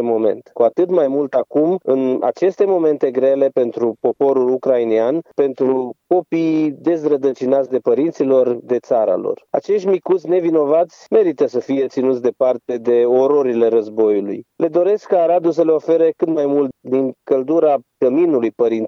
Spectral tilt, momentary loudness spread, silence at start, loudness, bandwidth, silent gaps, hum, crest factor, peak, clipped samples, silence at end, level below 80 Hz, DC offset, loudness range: -8 dB/octave; 5 LU; 0 s; -17 LUFS; 7 kHz; none; none; 14 dB; -2 dBFS; under 0.1%; 0 s; -76 dBFS; under 0.1%; 1 LU